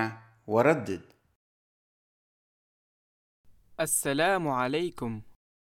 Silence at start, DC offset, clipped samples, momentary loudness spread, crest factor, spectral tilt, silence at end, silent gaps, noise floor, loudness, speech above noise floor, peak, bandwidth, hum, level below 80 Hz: 0 s; under 0.1%; under 0.1%; 16 LU; 22 dB; -4 dB/octave; 0.3 s; 1.35-3.44 s; under -90 dBFS; -28 LUFS; over 63 dB; -10 dBFS; 17.5 kHz; none; -64 dBFS